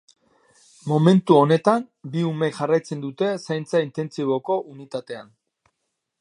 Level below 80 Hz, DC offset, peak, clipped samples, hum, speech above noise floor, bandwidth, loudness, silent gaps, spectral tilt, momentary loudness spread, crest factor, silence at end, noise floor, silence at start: -72 dBFS; under 0.1%; -2 dBFS; under 0.1%; none; 57 dB; 11 kHz; -22 LUFS; none; -7.5 dB/octave; 17 LU; 20 dB; 1 s; -78 dBFS; 0.85 s